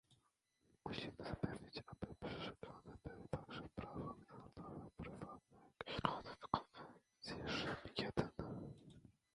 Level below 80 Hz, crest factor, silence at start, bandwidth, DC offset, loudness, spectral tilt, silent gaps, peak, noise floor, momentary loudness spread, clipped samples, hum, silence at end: -66 dBFS; 30 dB; 0.1 s; 11 kHz; under 0.1%; -49 LUFS; -6 dB/octave; none; -18 dBFS; -82 dBFS; 14 LU; under 0.1%; none; 0.25 s